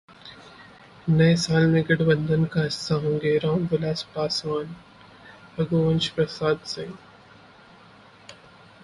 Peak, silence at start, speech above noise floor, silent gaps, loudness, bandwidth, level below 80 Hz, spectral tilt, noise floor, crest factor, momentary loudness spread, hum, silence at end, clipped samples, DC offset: -6 dBFS; 0.25 s; 28 dB; none; -23 LUFS; 11.5 kHz; -54 dBFS; -6 dB/octave; -51 dBFS; 18 dB; 19 LU; none; 0.5 s; under 0.1%; under 0.1%